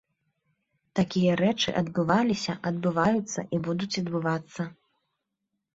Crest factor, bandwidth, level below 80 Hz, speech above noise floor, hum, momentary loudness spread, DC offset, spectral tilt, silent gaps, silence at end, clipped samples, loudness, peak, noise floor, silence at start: 18 dB; 8 kHz; -62 dBFS; 56 dB; none; 8 LU; under 0.1%; -5.5 dB/octave; none; 1 s; under 0.1%; -27 LUFS; -10 dBFS; -82 dBFS; 0.95 s